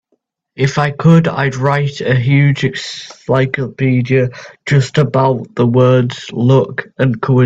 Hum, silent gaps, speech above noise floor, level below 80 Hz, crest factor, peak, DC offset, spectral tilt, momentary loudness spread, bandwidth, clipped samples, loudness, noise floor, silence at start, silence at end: none; none; 52 dB; -48 dBFS; 14 dB; 0 dBFS; under 0.1%; -7 dB/octave; 9 LU; 7.8 kHz; under 0.1%; -14 LUFS; -65 dBFS; 0.55 s; 0 s